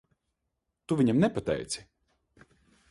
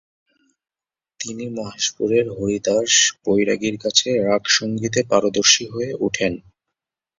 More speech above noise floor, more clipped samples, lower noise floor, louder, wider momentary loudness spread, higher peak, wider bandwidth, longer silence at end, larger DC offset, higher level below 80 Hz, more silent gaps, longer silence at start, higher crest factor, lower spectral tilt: second, 56 dB vs over 70 dB; neither; second, -82 dBFS vs under -90 dBFS; second, -28 LUFS vs -18 LUFS; about the same, 12 LU vs 14 LU; second, -14 dBFS vs 0 dBFS; first, 11.5 kHz vs 7.8 kHz; first, 1.1 s vs 0.8 s; neither; about the same, -58 dBFS vs -56 dBFS; neither; second, 0.9 s vs 1.2 s; about the same, 18 dB vs 20 dB; first, -6 dB/octave vs -2.5 dB/octave